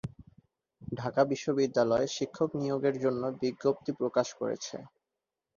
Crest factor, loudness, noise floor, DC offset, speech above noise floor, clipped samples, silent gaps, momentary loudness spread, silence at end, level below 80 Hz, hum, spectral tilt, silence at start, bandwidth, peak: 20 dB; -31 LUFS; -88 dBFS; under 0.1%; 58 dB; under 0.1%; none; 13 LU; 0.7 s; -66 dBFS; none; -5.5 dB/octave; 0.05 s; 7.4 kHz; -12 dBFS